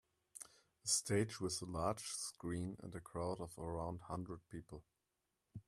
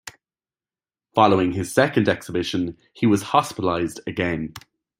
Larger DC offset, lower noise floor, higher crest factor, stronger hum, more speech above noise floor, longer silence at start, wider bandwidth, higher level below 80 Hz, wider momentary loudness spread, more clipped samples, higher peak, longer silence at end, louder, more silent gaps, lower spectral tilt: neither; about the same, -88 dBFS vs under -90 dBFS; about the same, 24 dB vs 22 dB; neither; second, 45 dB vs over 69 dB; first, 0.35 s vs 0.05 s; about the same, 15.5 kHz vs 16 kHz; second, -66 dBFS vs -56 dBFS; first, 18 LU vs 10 LU; neither; second, -22 dBFS vs -2 dBFS; second, 0.05 s vs 0.4 s; second, -43 LUFS vs -22 LUFS; neither; second, -4 dB/octave vs -5.5 dB/octave